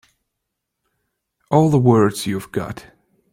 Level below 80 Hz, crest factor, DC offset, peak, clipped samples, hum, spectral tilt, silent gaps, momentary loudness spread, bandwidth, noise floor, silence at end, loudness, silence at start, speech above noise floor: -54 dBFS; 18 dB; under 0.1%; -2 dBFS; under 0.1%; none; -7 dB/octave; none; 15 LU; 16.5 kHz; -79 dBFS; 0.5 s; -17 LUFS; 1.5 s; 62 dB